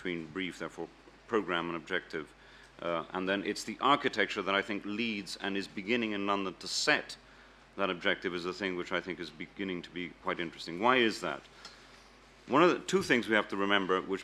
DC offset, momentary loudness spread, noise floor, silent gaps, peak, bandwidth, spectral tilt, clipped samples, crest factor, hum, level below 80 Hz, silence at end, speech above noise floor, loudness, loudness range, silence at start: under 0.1%; 14 LU; -57 dBFS; none; -10 dBFS; 14.5 kHz; -4 dB/octave; under 0.1%; 24 dB; none; -66 dBFS; 0 s; 25 dB; -32 LUFS; 6 LU; 0 s